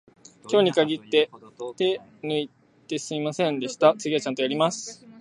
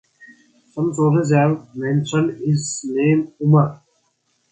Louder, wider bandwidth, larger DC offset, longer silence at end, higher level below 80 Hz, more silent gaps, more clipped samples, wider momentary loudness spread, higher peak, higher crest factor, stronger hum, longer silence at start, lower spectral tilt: second, -25 LUFS vs -19 LUFS; first, 11.5 kHz vs 9.4 kHz; neither; second, 0 s vs 0.75 s; second, -74 dBFS vs -60 dBFS; neither; neither; first, 13 LU vs 8 LU; about the same, -4 dBFS vs -2 dBFS; about the same, 22 dB vs 18 dB; neither; first, 0.45 s vs 0.2 s; second, -4.5 dB/octave vs -7 dB/octave